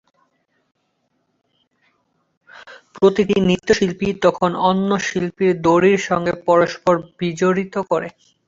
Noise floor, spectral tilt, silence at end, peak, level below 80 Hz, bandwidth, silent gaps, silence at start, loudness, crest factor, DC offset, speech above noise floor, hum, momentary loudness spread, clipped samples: -68 dBFS; -6 dB/octave; 0.4 s; -2 dBFS; -52 dBFS; 7.8 kHz; none; 2.65 s; -18 LUFS; 18 dB; under 0.1%; 51 dB; none; 7 LU; under 0.1%